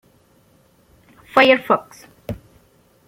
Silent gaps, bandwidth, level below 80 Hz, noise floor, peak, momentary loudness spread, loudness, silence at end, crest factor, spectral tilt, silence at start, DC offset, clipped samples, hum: none; 16 kHz; -54 dBFS; -56 dBFS; 0 dBFS; 22 LU; -16 LUFS; 0.75 s; 22 dB; -5 dB/octave; 1.35 s; under 0.1%; under 0.1%; none